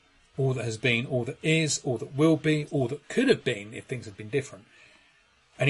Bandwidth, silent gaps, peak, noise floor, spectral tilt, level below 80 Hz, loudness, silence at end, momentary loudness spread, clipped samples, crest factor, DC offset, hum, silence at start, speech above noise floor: 11.5 kHz; none; -8 dBFS; -63 dBFS; -5 dB/octave; -64 dBFS; -27 LUFS; 0 s; 13 LU; under 0.1%; 20 dB; under 0.1%; none; 0.4 s; 36 dB